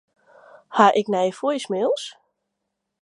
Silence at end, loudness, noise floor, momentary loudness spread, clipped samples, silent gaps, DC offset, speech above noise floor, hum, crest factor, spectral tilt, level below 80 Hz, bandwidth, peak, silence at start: 0.9 s; -21 LUFS; -79 dBFS; 11 LU; under 0.1%; none; under 0.1%; 59 dB; none; 22 dB; -4.5 dB/octave; -78 dBFS; 11.5 kHz; -2 dBFS; 0.7 s